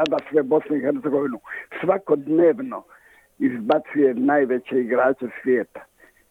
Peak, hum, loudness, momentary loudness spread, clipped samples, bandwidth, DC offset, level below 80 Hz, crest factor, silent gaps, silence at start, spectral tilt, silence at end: -6 dBFS; none; -21 LUFS; 10 LU; under 0.1%; 7 kHz; under 0.1%; -68 dBFS; 16 dB; none; 0 s; -7.5 dB/octave; 0.45 s